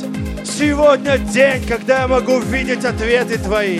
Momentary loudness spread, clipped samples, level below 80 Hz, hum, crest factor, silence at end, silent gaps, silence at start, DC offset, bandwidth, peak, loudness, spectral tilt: 6 LU; under 0.1%; -30 dBFS; none; 16 dB; 0 s; none; 0 s; under 0.1%; 14 kHz; 0 dBFS; -16 LUFS; -5 dB/octave